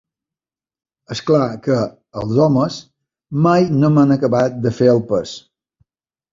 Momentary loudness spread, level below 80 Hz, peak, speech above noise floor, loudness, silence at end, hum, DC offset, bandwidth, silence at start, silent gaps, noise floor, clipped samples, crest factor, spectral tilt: 13 LU; -52 dBFS; -2 dBFS; over 75 dB; -16 LUFS; 0.95 s; none; under 0.1%; 7.6 kHz; 1.1 s; none; under -90 dBFS; under 0.1%; 16 dB; -7.5 dB/octave